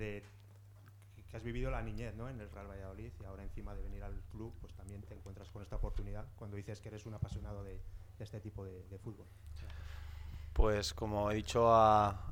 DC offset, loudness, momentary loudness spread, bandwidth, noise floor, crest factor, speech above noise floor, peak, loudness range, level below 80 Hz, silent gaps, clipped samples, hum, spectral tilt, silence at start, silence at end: under 0.1%; -37 LUFS; 21 LU; 17.5 kHz; -58 dBFS; 24 dB; 20 dB; -16 dBFS; 14 LU; -46 dBFS; none; under 0.1%; none; -6 dB/octave; 0 s; 0 s